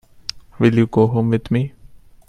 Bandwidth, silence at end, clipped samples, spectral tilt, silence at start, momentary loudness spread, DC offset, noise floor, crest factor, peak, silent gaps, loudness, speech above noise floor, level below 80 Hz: 9.6 kHz; 0.4 s; under 0.1%; -8 dB/octave; 0.35 s; 16 LU; under 0.1%; -43 dBFS; 18 dB; 0 dBFS; none; -18 LUFS; 27 dB; -46 dBFS